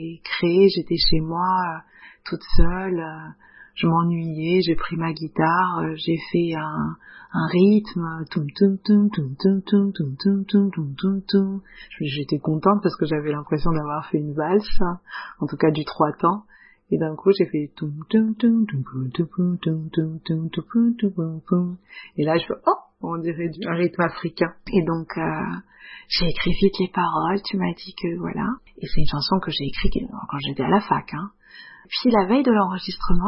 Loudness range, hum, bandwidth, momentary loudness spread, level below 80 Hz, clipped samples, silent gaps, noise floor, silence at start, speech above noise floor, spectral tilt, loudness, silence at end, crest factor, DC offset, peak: 3 LU; none; 5.8 kHz; 11 LU; -34 dBFS; under 0.1%; none; -45 dBFS; 0 s; 24 dB; -10.5 dB/octave; -23 LUFS; 0 s; 20 dB; under 0.1%; -2 dBFS